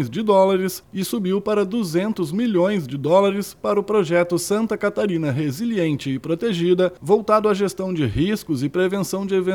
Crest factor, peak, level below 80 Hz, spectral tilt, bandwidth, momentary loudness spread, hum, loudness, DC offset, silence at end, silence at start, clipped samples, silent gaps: 16 dB; -4 dBFS; -50 dBFS; -6 dB/octave; 18.5 kHz; 6 LU; none; -20 LUFS; under 0.1%; 0 s; 0 s; under 0.1%; none